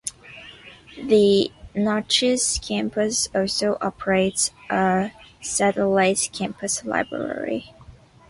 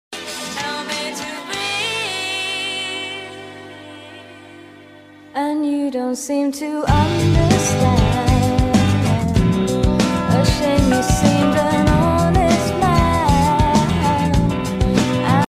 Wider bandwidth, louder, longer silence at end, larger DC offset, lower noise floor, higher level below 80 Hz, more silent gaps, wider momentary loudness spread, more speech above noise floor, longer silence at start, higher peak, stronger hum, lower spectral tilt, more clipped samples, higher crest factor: second, 11.5 kHz vs 16 kHz; second, -22 LUFS vs -17 LUFS; first, 0.4 s vs 0.05 s; neither; first, -47 dBFS vs -42 dBFS; second, -50 dBFS vs -28 dBFS; neither; about the same, 14 LU vs 12 LU; about the same, 26 dB vs 26 dB; about the same, 0.05 s vs 0.1 s; second, -6 dBFS vs -2 dBFS; second, none vs 50 Hz at -35 dBFS; second, -3 dB/octave vs -5.5 dB/octave; neither; about the same, 18 dB vs 16 dB